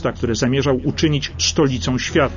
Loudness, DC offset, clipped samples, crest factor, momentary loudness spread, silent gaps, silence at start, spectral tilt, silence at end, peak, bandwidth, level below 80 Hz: -18 LUFS; under 0.1%; under 0.1%; 14 dB; 3 LU; none; 0 s; -4.5 dB/octave; 0 s; -4 dBFS; 7.4 kHz; -36 dBFS